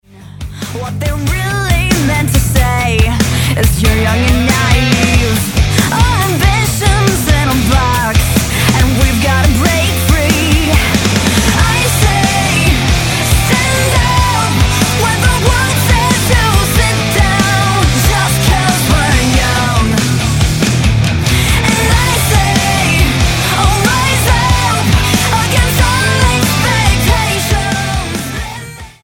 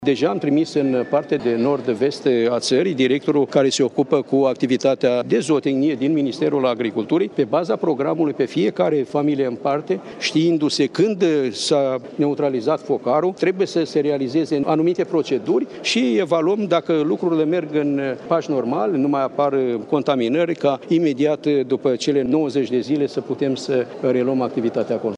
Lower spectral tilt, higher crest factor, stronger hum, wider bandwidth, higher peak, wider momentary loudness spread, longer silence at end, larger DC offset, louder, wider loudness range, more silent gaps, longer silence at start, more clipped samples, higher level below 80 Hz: second, -4 dB/octave vs -5.5 dB/octave; second, 10 dB vs 16 dB; neither; first, 17.5 kHz vs 11 kHz; about the same, 0 dBFS vs -2 dBFS; about the same, 3 LU vs 4 LU; first, 0.15 s vs 0 s; neither; first, -11 LUFS vs -20 LUFS; about the same, 1 LU vs 2 LU; neither; first, 0.15 s vs 0 s; neither; first, -18 dBFS vs -66 dBFS